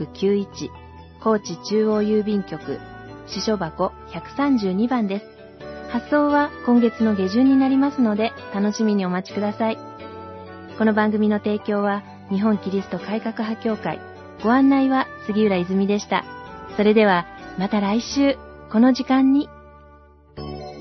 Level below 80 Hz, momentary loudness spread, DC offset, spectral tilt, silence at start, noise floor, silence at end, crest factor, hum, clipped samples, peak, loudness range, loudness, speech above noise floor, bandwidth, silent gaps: -54 dBFS; 17 LU; under 0.1%; -6.5 dB/octave; 0 s; -49 dBFS; 0 s; 16 dB; none; under 0.1%; -4 dBFS; 4 LU; -21 LUFS; 29 dB; 6.2 kHz; none